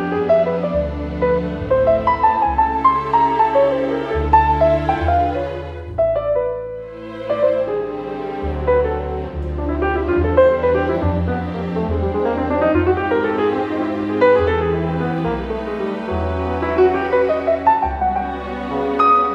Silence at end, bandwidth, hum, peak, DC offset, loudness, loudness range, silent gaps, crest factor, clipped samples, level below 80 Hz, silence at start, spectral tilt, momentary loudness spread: 0 s; 7 kHz; none; 0 dBFS; under 0.1%; -18 LUFS; 5 LU; none; 16 dB; under 0.1%; -32 dBFS; 0 s; -8.5 dB/octave; 10 LU